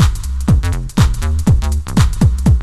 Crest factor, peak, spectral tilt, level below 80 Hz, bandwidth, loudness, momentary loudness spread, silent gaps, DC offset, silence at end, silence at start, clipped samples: 12 dB; 0 dBFS; -6.5 dB/octave; -16 dBFS; 14 kHz; -15 LUFS; 4 LU; none; under 0.1%; 0 s; 0 s; under 0.1%